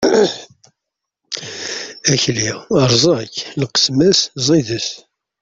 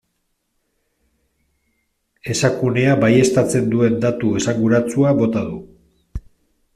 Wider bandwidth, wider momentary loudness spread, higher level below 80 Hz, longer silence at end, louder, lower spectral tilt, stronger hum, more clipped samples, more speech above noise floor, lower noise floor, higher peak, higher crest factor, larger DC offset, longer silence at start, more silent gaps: second, 8 kHz vs 14.5 kHz; second, 13 LU vs 21 LU; second, -52 dBFS vs -46 dBFS; second, 0.4 s vs 0.55 s; about the same, -16 LUFS vs -17 LUFS; second, -4 dB/octave vs -6 dB/octave; neither; neither; first, 65 dB vs 54 dB; first, -80 dBFS vs -70 dBFS; about the same, 0 dBFS vs -2 dBFS; about the same, 16 dB vs 16 dB; neither; second, 0 s vs 2.25 s; neither